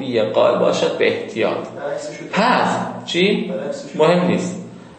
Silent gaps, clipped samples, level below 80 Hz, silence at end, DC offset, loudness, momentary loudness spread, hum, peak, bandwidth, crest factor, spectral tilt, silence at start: none; under 0.1%; -66 dBFS; 0 s; under 0.1%; -18 LUFS; 11 LU; none; -2 dBFS; 8.8 kHz; 16 dB; -5.5 dB/octave; 0 s